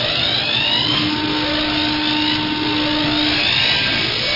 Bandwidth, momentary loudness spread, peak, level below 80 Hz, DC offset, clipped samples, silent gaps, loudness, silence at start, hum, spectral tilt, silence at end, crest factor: 5.8 kHz; 4 LU; -4 dBFS; -42 dBFS; 0.2%; under 0.1%; none; -16 LUFS; 0 s; none; -4.5 dB/octave; 0 s; 14 dB